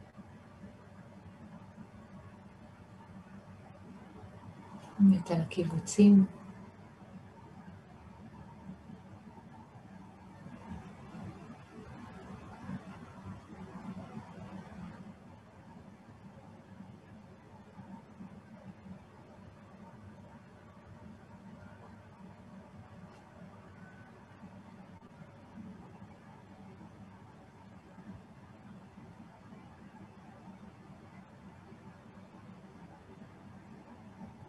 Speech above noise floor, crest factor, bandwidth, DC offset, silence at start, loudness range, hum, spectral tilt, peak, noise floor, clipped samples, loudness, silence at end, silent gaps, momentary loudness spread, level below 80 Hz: 30 dB; 26 dB; 11 kHz; under 0.1%; 0 s; 25 LU; none; -7.5 dB/octave; -12 dBFS; -55 dBFS; under 0.1%; -32 LUFS; 0 s; none; 9 LU; -68 dBFS